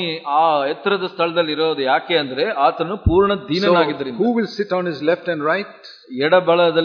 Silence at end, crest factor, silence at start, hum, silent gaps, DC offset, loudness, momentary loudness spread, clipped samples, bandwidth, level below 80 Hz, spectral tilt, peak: 0 s; 16 dB; 0 s; none; none; under 0.1%; -18 LUFS; 6 LU; under 0.1%; 5.4 kHz; -38 dBFS; -7 dB/octave; -2 dBFS